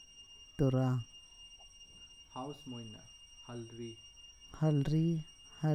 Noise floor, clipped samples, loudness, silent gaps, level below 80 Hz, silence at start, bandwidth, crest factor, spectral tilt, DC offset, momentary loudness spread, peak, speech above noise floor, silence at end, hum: -57 dBFS; under 0.1%; -36 LUFS; none; -58 dBFS; 0 s; 9 kHz; 18 dB; -7.5 dB/octave; under 0.1%; 22 LU; -20 dBFS; 22 dB; 0 s; none